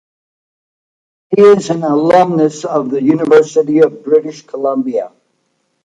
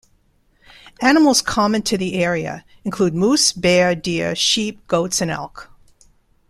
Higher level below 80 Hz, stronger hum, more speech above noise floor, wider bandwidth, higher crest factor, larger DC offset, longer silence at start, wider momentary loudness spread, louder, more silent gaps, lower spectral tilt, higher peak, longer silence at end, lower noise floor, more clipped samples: second, -60 dBFS vs -48 dBFS; neither; first, 53 dB vs 41 dB; second, 9.2 kHz vs 14 kHz; second, 12 dB vs 18 dB; neither; first, 1.3 s vs 0.85 s; about the same, 11 LU vs 12 LU; first, -12 LUFS vs -17 LUFS; neither; first, -6.5 dB/octave vs -3.5 dB/octave; about the same, 0 dBFS vs -2 dBFS; about the same, 0.9 s vs 0.85 s; first, -64 dBFS vs -59 dBFS; neither